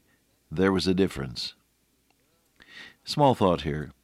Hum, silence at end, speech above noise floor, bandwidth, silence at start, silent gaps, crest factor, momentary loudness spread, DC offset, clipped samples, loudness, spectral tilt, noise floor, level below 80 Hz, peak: none; 0.15 s; 44 dB; 14.5 kHz; 0.5 s; none; 20 dB; 18 LU; under 0.1%; under 0.1%; -26 LUFS; -6 dB/octave; -69 dBFS; -52 dBFS; -8 dBFS